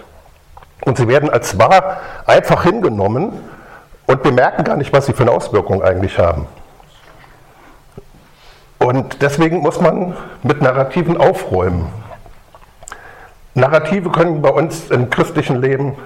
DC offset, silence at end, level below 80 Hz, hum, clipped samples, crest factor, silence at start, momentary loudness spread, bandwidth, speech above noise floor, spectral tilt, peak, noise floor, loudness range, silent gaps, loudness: under 0.1%; 0 s; -38 dBFS; none; under 0.1%; 16 dB; 0.8 s; 11 LU; 16 kHz; 29 dB; -6.5 dB/octave; 0 dBFS; -43 dBFS; 6 LU; none; -14 LUFS